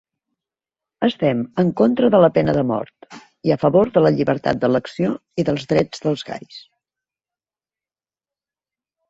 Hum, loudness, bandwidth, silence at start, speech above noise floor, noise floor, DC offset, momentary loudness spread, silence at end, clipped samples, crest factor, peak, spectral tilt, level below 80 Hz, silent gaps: none; -18 LUFS; 7.8 kHz; 1 s; over 72 dB; under -90 dBFS; under 0.1%; 10 LU; 2.5 s; under 0.1%; 18 dB; -2 dBFS; -7.5 dB/octave; -54 dBFS; none